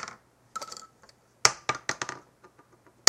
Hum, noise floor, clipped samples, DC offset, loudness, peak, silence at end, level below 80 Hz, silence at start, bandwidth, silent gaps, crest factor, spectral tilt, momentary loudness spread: none; -60 dBFS; under 0.1%; under 0.1%; -29 LUFS; 0 dBFS; 0.9 s; -70 dBFS; 0 s; 16.5 kHz; none; 32 dB; 0 dB/octave; 19 LU